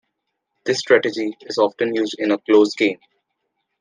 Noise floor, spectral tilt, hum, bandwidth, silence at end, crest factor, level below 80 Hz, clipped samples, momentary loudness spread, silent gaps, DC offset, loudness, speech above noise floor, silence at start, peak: -76 dBFS; -4 dB/octave; none; 9.6 kHz; 0.85 s; 18 dB; -74 dBFS; under 0.1%; 10 LU; none; under 0.1%; -19 LUFS; 58 dB; 0.65 s; -2 dBFS